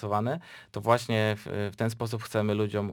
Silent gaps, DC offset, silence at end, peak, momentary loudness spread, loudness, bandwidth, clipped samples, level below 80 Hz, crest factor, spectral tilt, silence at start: none; under 0.1%; 0 s; -8 dBFS; 8 LU; -29 LUFS; 19.5 kHz; under 0.1%; -66 dBFS; 22 dB; -6.5 dB/octave; 0 s